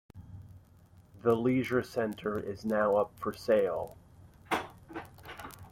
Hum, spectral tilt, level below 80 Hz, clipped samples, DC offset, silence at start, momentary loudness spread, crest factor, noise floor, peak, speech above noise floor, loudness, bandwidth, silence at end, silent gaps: none; -6.5 dB/octave; -62 dBFS; under 0.1%; under 0.1%; 0.15 s; 19 LU; 20 dB; -59 dBFS; -14 dBFS; 29 dB; -31 LUFS; 16.5 kHz; 0.05 s; none